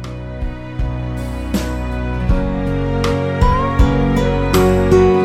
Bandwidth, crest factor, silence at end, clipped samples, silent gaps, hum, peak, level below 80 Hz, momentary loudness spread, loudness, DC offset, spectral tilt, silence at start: 15.5 kHz; 14 dB; 0 s; under 0.1%; none; none; 0 dBFS; -22 dBFS; 12 LU; -17 LUFS; under 0.1%; -7 dB/octave; 0 s